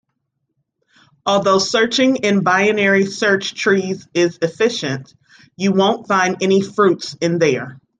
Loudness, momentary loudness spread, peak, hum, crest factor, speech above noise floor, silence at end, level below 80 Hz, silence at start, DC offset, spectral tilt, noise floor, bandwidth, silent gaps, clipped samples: -16 LUFS; 7 LU; -2 dBFS; none; 16 dB; 56 dB; 0.25 s; -62 dBFS; 1.25 s; under 0.1%; -4.5 dB/octave; -73 dBFS; 9.4 kHz; none; under 0.1%